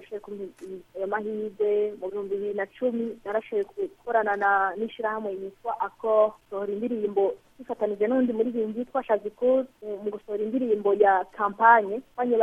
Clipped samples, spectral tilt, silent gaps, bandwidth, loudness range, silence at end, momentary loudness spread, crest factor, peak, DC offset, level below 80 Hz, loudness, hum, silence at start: under 0.1%; -7 dB/octave; none; 3.8 kHz; 5 LU; 0 s; 13 LU; 22 dB; -4 dBFS; under 0.1%; -66 dBFS; -26 LUFS; none; 0 s